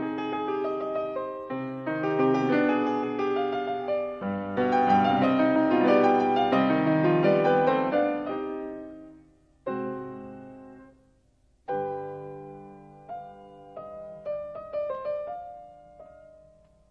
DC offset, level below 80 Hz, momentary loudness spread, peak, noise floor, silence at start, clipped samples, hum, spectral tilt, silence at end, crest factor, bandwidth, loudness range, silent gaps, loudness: under 0.1%; -64 dBFS; 21 LU; -8 dBFS; -65 dBFS; 0 s; under 0.1%; none; -8 dB/octave; 0.85 s; 18 dB; 7 kHz; 16 LU; none; -26 LUFS